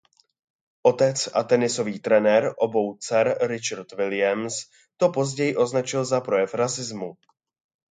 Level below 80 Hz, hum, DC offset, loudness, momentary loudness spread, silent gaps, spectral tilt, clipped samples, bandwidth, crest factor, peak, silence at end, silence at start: -72 dBFS; none; under 0.1%; -23 LUFS; 9 LU; none; -4.5 dB/octave; under 0.1%; 9.6 kHz; 20 dB; -4 dBFS; 0.8 s; 0.85 s